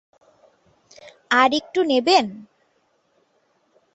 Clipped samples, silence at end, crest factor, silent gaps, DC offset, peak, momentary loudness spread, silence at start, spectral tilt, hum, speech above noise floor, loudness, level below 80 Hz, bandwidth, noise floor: under 0.1%; 1.55 s; 22 dB; none; under 0.1%; -2 dBFS; 5 LU; 1.3 s; -3 dB/octave; none; 47 dB; -19 LUFS; -70 dBFS; 8.2 kHz; -66 dBFS